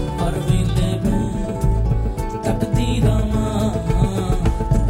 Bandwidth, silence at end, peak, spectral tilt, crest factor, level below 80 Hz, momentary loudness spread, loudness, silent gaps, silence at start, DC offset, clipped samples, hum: 16 kHz; 0 s; -4 dBFS; -7 dB/octave; 14 dB; -22 dBFS; 4 LU; -20 LUFS; none; 0 s; under 0.1%; under 0.1%; none